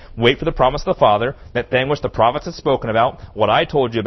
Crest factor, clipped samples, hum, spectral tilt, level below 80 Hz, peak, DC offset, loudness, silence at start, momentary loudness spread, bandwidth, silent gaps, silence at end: 18 dB; under 0.1%; none; -6 dB/octave; -36 dBFS; 0 dBFS; under 0.1%; -18 LUFS; 0 s; 6 LU; 6.2 kHz; none; 0 s